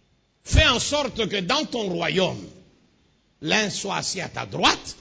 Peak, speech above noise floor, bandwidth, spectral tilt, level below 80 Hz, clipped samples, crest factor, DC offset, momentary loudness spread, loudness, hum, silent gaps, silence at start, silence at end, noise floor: -4 dBFS; 39 dB; 8 kHz; -3.5 dB/octave; -36 dBFS; under 0.1%; 20 dB; under 0.1%; 11 LU; -22 LUFS; none; none; 0.45 s; 0.05 s; -63 dBFS